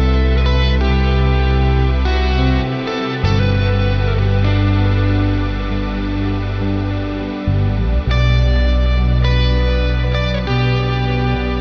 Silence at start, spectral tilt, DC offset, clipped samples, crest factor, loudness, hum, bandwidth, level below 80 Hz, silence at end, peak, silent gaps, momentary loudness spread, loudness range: 0 s; -7.5 dB/octave; under 0.1%; under 0.1%; 12 dB; -16 LUFS; none; 6.2 kHz; -18 dBFS; 0 s; -2 dBFS; none; 5 LU; 2 LU